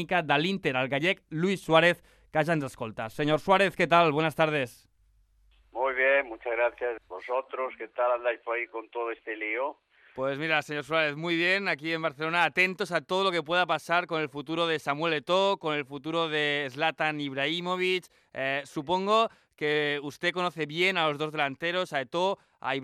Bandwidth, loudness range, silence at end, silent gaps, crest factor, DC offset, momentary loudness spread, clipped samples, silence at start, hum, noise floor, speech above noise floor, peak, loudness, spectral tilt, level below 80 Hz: 14.5 kHz; 4 LU; 0 s; none; 20 dB; under 0.1%; 10 LU; under 0.1%; 0 s; none; -65 dBFS; 37 dB; -8 dBFS; -28 LUFS; -5 dB/octave; -66 dBFS